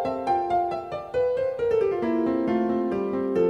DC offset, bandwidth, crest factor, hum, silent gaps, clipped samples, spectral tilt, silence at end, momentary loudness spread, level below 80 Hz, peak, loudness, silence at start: under 0.1%; 9.2 kHz; 12 dB; none; none; under 0.1%; -8 dB/octave; 0 s; 3 LU; -56 dBFS; -12 dBFS; -25 LUFS; 0 s